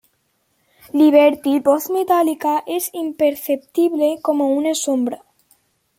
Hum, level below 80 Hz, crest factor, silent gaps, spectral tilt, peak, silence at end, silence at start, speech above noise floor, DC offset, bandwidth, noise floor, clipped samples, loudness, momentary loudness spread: none; -68 dBFS; 16 dB; none; -3 dB/octave; -2 dBFS; 0.8 s; 0.95 s; 49 dB; under 0.1%; 16.5 kHz; -66 dBFS; under 0.1%; -18 LUFS; 10 LU